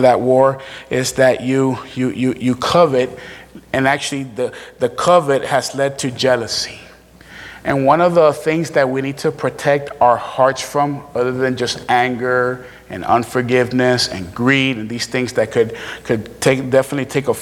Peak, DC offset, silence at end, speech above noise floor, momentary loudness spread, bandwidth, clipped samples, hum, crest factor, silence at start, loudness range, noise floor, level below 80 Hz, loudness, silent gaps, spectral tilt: 0 dBFS; under 0.1%; 0 s; 25 dB; 10 LU; 16 kHz; under 0.1%; none; 16 dB; 0 s; 2 LU; -42 dBFS; -50 dBFS; -17 LUFS; none; -5 dB/octave